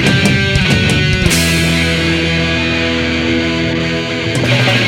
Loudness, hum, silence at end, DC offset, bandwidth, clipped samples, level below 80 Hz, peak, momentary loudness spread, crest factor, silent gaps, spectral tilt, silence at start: -12 LUFS; none; 0 s; under 0.1%; 17 kHz; under 0.1%; -28 dBFS; 0 dBFS; 4 LU; 12 dB; none; -4.5 dB/octave; 0 s